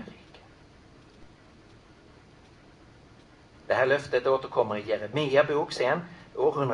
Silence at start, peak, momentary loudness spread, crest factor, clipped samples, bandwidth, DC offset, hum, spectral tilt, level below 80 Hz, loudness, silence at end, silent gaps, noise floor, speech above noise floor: 0 s; -10 dBFS; 7 LU; 20 dB; under 0.1%; 11 kHz; under 0.1%; none; -5.5 dB/octave; -62 dBFS; -27 LUFS; 0 s; none; -54 dBFS; 28 dB